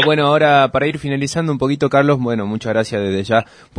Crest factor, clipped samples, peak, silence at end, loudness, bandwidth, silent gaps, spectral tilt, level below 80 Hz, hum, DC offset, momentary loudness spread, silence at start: 14 dB; under 0.1%; -2 dBFS; 0.35 s; -16 LUFS; 10.5 kHz; none; -6 dB/octave; -48 dBFS; none; under 0.1%; 8 LU; 0 s